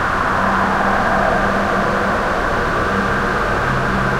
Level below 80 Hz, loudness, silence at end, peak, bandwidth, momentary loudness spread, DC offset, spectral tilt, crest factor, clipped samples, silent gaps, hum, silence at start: -30 dBFS; -17 LUFS; 0 s; -2 dBFS; 16 kHz; 2 LU; under 0.1%; -5.5 dB/octave; 14 dB; under 0.1%; none; none; 0 s